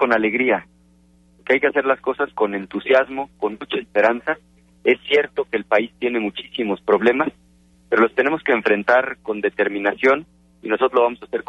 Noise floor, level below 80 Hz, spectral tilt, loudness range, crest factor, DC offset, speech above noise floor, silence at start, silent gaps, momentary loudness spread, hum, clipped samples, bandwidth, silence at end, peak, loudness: -54 dBFS; -58 dBFS; -6 dB/octave; 2 LU; 16 dB; under 0.1%; 35 dB; 0 s; none; 9 LU; none; under 0.1%; 7.6 kHz; 0.1 s; -4 dBFS; -20 LUFS